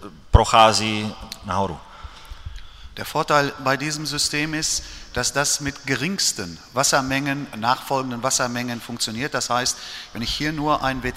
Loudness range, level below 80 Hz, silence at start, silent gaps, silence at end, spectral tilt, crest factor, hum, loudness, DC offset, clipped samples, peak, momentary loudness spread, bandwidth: 3 LU; -36 dBFS; 0 s; none; 0 s; -3 dB/octave; 22 dB; none; -21 LUFS; under 0.1%; under 0.1%; 0 dBFS; 15 LU; 16 kHz